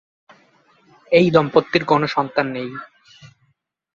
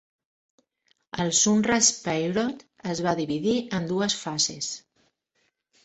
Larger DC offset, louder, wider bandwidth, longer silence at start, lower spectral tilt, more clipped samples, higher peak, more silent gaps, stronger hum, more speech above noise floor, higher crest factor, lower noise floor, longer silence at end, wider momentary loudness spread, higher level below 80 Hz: neither; first, -18 LUFS vs -24 LUFS; second, 7.4 kHz vs 8.4 kHz; about the same, 1.1 s vs 1.15 s; first, -7 dB/octave vs -3 dB/octave; neither; first, 0 dBFS vs -8 dBFS; neither; neither; about the same, 49 dB vs 48 dB; about the same, 20 dB vs 20 dB; second, -66 dBFS vs -73 dBFS; second, 0.7 s vs 1.05 s; about the same, 15 LU vs 13 LU; about the same, -58 dBFS vs -60 dBFS